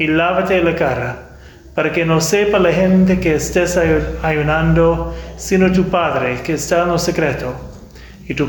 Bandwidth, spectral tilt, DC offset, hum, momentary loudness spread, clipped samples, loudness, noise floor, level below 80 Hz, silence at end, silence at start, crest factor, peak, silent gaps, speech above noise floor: 19.5 kHz; -5.5 dB/octave; under 0.1%; none; 13 LU; under 0.1%; -15 LUFS; -37 dBFS; -32 dBFS; 0 s; 0 s; 12 dB; -4 dBFS; none; 22 dB